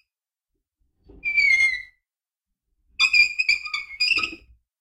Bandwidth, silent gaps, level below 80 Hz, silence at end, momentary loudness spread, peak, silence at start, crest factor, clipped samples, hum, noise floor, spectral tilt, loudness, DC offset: 15.5 kHz; none; -58 dBFS; 0.45 s; 14 LU; -6 dBFS; 1.25 s; 20 dB; under 0.1%; none; -88 dBFS; 1 dB/octave; -19 LUFS; under 0.1%